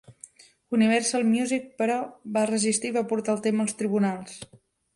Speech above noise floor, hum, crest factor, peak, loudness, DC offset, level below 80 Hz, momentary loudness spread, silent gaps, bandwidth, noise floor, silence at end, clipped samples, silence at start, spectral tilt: 26 dB; none; 16 dB; -10 dBFS; -25 LUFS; under 0.1%; -70 dBFS; 8 LU; none; 11.5 kHz; -51 dBFS; 0.5 s; under 0.1%; 0.1 s; -4.5 dB/octave